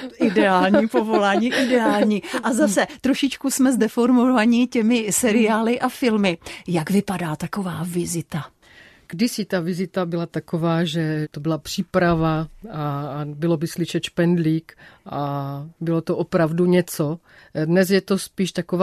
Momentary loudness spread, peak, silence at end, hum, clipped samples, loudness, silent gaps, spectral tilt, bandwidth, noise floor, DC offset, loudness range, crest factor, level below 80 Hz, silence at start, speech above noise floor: 10 LU; -6 dBFS; 0 s; none; under 0.1%; -21 LUFS; none; -5.5 dB/octave; 14 kHz; -49 dBFS; under 0.1%; 6 LU; 16 dB; -52 dBFS; 0 s; 29 dB